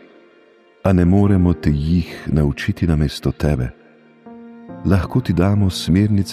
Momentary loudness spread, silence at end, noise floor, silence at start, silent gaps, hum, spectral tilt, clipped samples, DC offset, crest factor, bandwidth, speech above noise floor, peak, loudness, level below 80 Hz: 9 LU; 0 s; -51 dBFS; 0.85 s; none; none; -7.5 dB/octave; under 0.1%; under 0.1%; 14 dB; 14 kHz; 35 dB; -2 dBFS; -18 LUFS; -30 dBFS